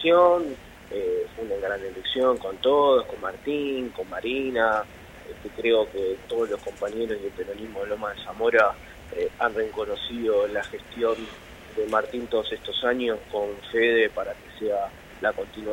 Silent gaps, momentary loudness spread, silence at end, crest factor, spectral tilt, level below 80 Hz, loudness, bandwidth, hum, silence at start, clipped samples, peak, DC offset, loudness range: none; 14 LU; 0 s; 20 dB; -4.5 dB/octave; -52 dBFS; -26 LUFS; 16.5 kHz; none; 0 s; under 0.1%; -6 dBFS; under 0.1%; 3 LU